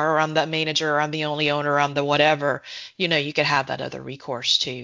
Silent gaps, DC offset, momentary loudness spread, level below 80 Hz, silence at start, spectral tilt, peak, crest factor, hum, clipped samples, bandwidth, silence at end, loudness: none; under 0.1%; 11 LU; -64 dBFS; 0 s; -4 dB/octave; -2 dBFS; 20 dB; none; under 0.1%; 7.6 kHz; 0 s; -22 LUFS